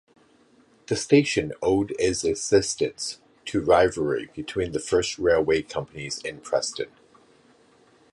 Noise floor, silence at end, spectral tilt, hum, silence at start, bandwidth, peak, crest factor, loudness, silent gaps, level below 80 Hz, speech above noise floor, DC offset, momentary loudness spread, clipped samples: -59 dBFS; 1.25 s; -4 dB/octave; none; 0.9 s; 11.5 kHz; -4 dBFS; 20 dB; -24 LUFS; none; -50 dBFS; 35 dB; under 0.1%; 13 LU; under 0.1%